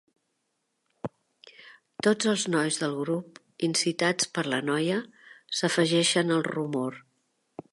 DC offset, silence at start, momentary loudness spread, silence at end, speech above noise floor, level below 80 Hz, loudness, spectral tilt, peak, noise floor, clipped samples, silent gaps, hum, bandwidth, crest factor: under 0.1%; 1.05 s; 18 LU; 0.1 s; 51 dB; -76 dBFS; -27 LUFS; -3.5 dB/octave; -10 dBFS; -78 dBFS; under 0.1%; none; none; 11.5 kHz; 18 dB